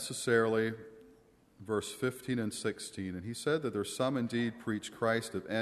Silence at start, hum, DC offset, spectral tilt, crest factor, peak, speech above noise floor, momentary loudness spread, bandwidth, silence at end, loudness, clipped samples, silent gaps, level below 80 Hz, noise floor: 0 s; none; under 0.1%; -4.5 dB/octave; 20 dB; -14 dBFS; 29 dB; 10 LU; 13.5 kHz; 0 s; -34 LUFS; under 0.1%; none; -70 dBFS; -63 dBFS